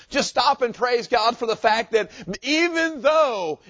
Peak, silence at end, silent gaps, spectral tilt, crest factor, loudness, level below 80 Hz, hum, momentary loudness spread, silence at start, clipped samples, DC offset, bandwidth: -4 dBFS; 0.15 s; none; -3 dB/octave; 18 dB; -21 LUFS; -58 dBFS; none; 5 LU; 0.1 s; under 0.1%; under 0.1%; 8 kHz